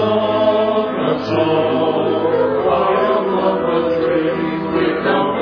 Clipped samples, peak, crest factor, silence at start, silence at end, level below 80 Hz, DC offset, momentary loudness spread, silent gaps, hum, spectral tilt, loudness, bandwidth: under 0.1%; -4 dBFS; 12 dB; 0 s; 0 s; -50 dBFS; under 0.1%; 3 LU; none; none; -8 dB/octave; -16 LUFS; 5.4 kHz